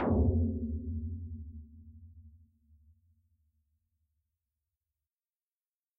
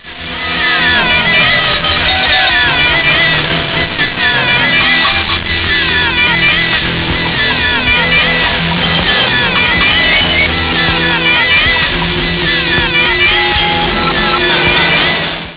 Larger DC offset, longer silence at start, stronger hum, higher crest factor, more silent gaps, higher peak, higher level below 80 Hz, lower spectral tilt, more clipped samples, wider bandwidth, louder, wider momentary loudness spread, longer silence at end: neither; about the same, 0 s vs 0.05 s; neither; first, 20 dB vs 12 dB; neither; second, -18 dBFS vs 0 dBFS; second, -44 dBFS vs -28 dBFS; about the same, -8 dB/octave vs -7 dB/octave; neither; second, 1.3 kHz vs 4 kHz; second, -34 LUFS vs -9 LUFS; first, 26 LU vs 5 LU; first, 3.65 s vs 0 s